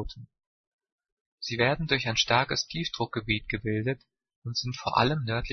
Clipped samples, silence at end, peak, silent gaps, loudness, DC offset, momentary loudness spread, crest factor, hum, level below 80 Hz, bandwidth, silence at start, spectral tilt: under 0.1%; 0 s; -6 dBFS; 0.46-0.79 s, 0.92-0.98 s, 1.12-1.38 s, 4.36-4.42 s; -28 LUFS; under 0.1%; 14 LU; 24 dB; none; -48 dBFS; 6.6 kHz; 0 s; -4.5 dB/octave